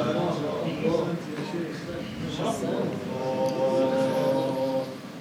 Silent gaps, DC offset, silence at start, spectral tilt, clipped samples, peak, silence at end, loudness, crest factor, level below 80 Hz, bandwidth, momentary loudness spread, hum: none; under 0.1%; 0 s; -6.5 dB/octave; under 0.1%; -12 dBFS; 0 s; -28 LUFS; 14 dB; -60 dBFS; 16 kHz; 9 LU; none